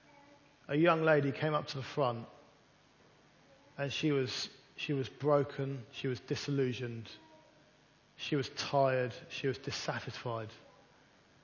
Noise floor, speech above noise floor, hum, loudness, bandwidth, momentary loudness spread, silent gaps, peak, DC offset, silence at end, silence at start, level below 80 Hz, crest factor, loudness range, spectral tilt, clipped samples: -66 dBFS; 32 dB; none; -35 LUFS; 7.2 kHz; 13 LU; none; -14 dBFS; under 0.1%; 0.85 s; 0.7 s; -72 dBFS; 22 dB; 4 LU; -5.5 dB/octave; under 0.1%